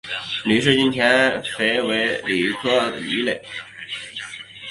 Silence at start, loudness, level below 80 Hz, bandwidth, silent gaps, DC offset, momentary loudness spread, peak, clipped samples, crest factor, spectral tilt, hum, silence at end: 0.05 s; -19 LUFS; -58 dBFS; 11.5 kHz; none; under 0.1%; 16 LU; -2 dBFS; under 0.1%; 20 dB; -4 dB/octave; none; 0 s